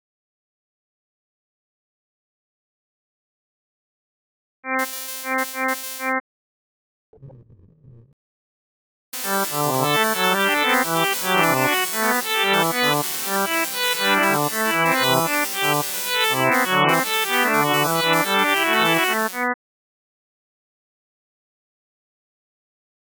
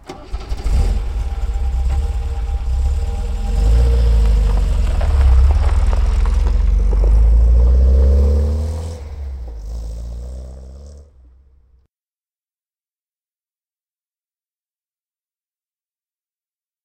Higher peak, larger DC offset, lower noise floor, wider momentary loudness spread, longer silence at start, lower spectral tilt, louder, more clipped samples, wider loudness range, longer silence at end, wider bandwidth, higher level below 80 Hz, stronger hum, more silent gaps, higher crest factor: about the same, 0 dBFS vs -2 dBFS; neither; second, -50 dBFS vs under -90 dBFS; second, 7 LU vs 17 LU; first, 4.65 s vs 0.1 s; second, -2.5 dB/octave vs -7.5 dB/octave; about the same, -19 LUFS vs -17 LUFS; neither; second, 12 LU vs 18 LU; second, 3.55 s vs 5.8 s; first, over 20 kHz vs 8.8 kHz; second, -74 dBFS vs -16 dBFS; neither; first, 6.20-7.13 s, 8.13-9.12 s vs none; first, 22 dB vs 14 dB